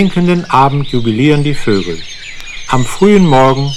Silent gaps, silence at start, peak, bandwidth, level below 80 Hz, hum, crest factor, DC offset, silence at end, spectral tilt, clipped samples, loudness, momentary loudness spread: none; 0 s; 0 dBFS; 13 kHz; -30 dBFS; none; 10 dB; under 0.1%; 0 s; -6.5 dB/octave; under 0.1%; -11 LUFS; 17 LU